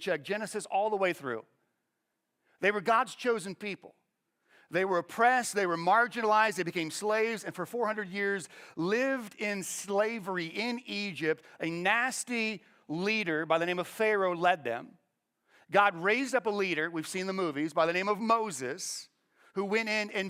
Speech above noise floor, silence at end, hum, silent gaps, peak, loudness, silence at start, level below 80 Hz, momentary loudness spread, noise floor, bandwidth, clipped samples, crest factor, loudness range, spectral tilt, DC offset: 52 dB; 0 s; none; none; -10 dBFS; -30 LUFS; 0 s; -80 dBFS; 11 LU; -83 dBFS; 16.5 kHz; under 0.1%; 22 dB; 4 LU; -3.5 dB/octave; under 0.1%